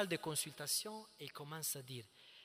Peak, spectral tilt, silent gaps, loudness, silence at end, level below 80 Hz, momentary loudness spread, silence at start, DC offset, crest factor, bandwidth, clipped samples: -24 dBFS; -2.5 dB/octave; none; -42 LUFS; 0 s; -84 dBFS; 13 LU; 0 s; under 0.1%; 22 dB; 16 kHz; under 0.1%